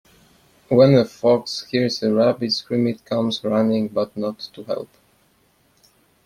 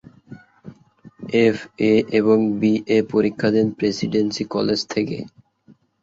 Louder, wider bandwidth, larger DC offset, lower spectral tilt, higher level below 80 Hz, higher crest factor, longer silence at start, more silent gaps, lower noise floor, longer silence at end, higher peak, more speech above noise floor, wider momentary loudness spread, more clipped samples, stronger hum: about the same, -20 LUFS vs -20 LUFS; first, 14 kHz vs 7.8 kHz; neither; about the same, -6.5 dB/octave vs -6 dB/octave; about the same, -60 dBFS vs -58 dBFS; about the same, 18 dB vs 16 dB; first, 0.7 s vs 0.3 s; neither; first, -61 dBFS vs -54 dBFS; first, 1.4 s vs 0.75 s; about the same, -2 dBFS vs -4 dBFS; first, 41 dB vs 35 dB; first, 14 LU vs 7 LU; neither; neither